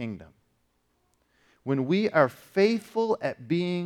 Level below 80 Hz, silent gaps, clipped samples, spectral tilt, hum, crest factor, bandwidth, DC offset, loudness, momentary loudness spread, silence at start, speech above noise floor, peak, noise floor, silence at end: -70 dBFS; none; under 0.1%; -7 dB/octave; none; 22 dB; 15 kHz; under 0.1%; -26 LUFS; 12 LU; 0 s; 45 dB; -6 dBFS; -72 dBFS; 0 s